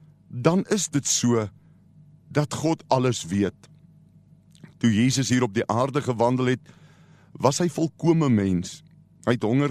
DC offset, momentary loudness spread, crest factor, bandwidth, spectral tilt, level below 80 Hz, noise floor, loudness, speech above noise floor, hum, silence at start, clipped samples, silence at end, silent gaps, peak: under 0.1%; 8 LU; 22 dB; 13 kHz; -5 dB/octave; -60 dBFS; -54 dBFS; -23 LUFS; 31 dB; none; 0.3 s; under 0.1%; 0 s; none; -4 dBFS